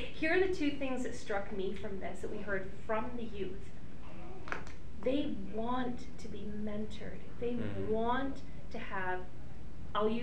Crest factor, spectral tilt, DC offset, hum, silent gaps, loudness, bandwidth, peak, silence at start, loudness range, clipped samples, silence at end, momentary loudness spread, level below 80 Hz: 20 dB; -6 dB/octave; 2%; none; none; -38 LUFS; 11 kHz; -18 dBFS; 0 s; 4 LU; under 0.1%; 0 s; 16 LU; -54 dBFS